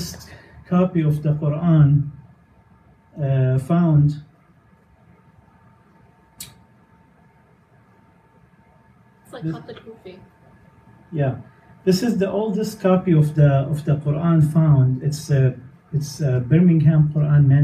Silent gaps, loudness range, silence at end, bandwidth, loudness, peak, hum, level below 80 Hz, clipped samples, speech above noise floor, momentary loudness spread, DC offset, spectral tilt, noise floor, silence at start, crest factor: none; 20 LU; 0 s; 14 kHz; -19 LUFS; -4 dBFS; none; -50 dBFS; under 0.1%; 37 dB; 19 LU; under 0.1%; -8.5 dB/octave; -54 dBFS; 0 s; 16 dB